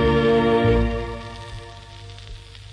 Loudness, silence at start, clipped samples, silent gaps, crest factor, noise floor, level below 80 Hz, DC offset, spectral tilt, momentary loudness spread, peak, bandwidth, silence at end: -20 LUFS; 0 s; under 0.1%; none; 14 dB; -39 dBFS; -32 dBFS; under 0.1%; -7.5 dB/octave; 22 LU; -8 dBFS; 10.5 kHz; 0 s